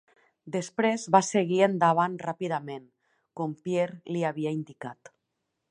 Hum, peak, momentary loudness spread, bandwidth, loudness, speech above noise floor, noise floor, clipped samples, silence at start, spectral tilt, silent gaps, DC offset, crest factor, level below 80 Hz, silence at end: none; -4 dBFS; 18 LU; 11 kHz; -27 LUFS; 54 dB; -81 dBFS; under 0.1%; 0.45 s; -5.5 dB/octave; none; under 0.1%; 24 dB; -78 dBFS; 0.8 s